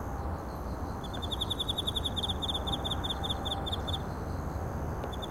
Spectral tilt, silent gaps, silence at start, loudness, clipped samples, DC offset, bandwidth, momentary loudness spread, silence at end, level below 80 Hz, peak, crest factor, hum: -5 dB/octave; none; 0 s; -34 LUFS; under 0.1%; 0.2%; 16 kHz; 7 LU; 0 s; -40 dBFS; -20 dBFS; 14 dB; none